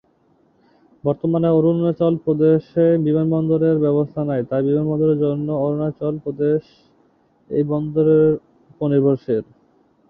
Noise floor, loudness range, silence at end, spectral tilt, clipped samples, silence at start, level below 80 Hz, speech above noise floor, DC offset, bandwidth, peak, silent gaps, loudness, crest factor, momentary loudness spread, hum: -59 dBFS; 4 LU; 0.65 s; -12.5 dB/octave; under 0.1%; 1.05 s; -56 dBFS; 41 dB; under 0.1%; 5 kHz; -4 dBFS; none; -19 LUFS; 14 dB; 8 LU; none